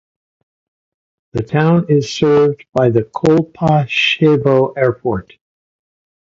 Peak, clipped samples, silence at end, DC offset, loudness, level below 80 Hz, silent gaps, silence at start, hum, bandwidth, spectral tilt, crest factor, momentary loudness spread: 0 dBFS; under 0.1%; 1 s; under 0.1%; -14 LUFS; -48 dBFS; none; 1.35 s; none; 7.6 kHz; -7 dB/octave; 16 dB; 9 LU